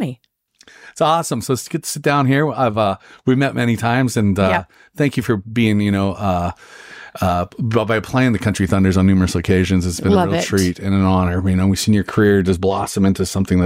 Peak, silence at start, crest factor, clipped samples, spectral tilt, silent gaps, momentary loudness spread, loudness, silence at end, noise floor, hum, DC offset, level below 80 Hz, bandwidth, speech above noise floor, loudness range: -4 dBFS; 0 s; 12 dB; under 0.1%; -6 dB/octave; none; 6 LU; -17 LUFS; 0 s; -55 dBFS; none; under 0.1%; -42 dBFS; 16 kHz; 39 dB; 3 LU